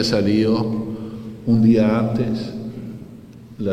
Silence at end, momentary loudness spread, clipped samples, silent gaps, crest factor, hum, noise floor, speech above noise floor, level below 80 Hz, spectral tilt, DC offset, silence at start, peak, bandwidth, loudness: 0 s; 19 LU; under 0.1%; none; 16 dB; none; -40 dBFS; 23 dB; -48 dBFS; -7 dB/octave; under 0.1%; 0 s; -4 dBFS; 10 kHz; -19 LUFS